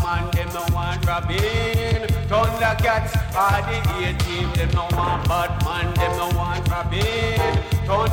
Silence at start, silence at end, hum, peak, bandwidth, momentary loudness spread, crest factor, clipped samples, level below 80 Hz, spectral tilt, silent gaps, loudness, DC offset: 0 s; 0 s; none; -8 dBFS; 17.5 kHz; 3 LU; 14 dB; under 0.1%; -28 dBFS; -5.5 dB/octave; none; -21 LUFS; under 0.1%